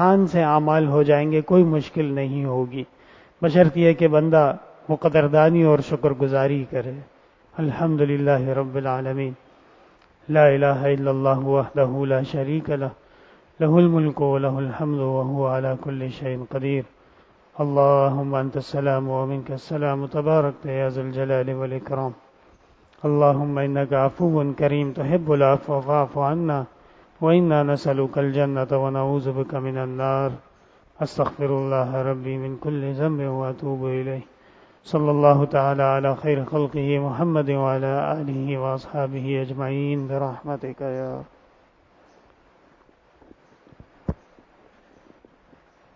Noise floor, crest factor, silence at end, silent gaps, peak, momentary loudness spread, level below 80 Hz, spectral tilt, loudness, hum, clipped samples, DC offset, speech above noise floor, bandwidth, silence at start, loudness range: -57 dBFS; 20 dB; 1.8 s; none; -2 dBFS; 12 LU; -54 dBFS; -9.5 dB/octave; -22 LUFS; none; under 0.1%; under 0.1%; 36 dB; 7.4 kHz; 0 s; 8 LU